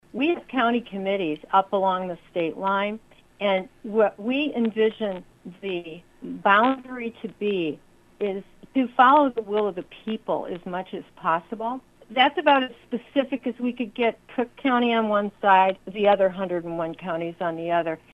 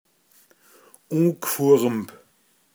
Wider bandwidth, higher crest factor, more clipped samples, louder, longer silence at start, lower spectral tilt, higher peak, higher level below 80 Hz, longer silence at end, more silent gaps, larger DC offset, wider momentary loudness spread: second, 9 kHz vs over 20 kHz; about the same, 20 dB vs 18 dB; neither; second, -24 LUFS vs -21 LUFS; second, 0.15 s vs 1.1 s; about the same, -7 dB/octave vs -6 dB/octave; about the same, -4 dBFS vs -6 dBFS; first, -62 dBFS vs -78 dBFS; second, 0.15 s vs 0.7 s; neither; neither; about the same, 14 LU vs 12 LU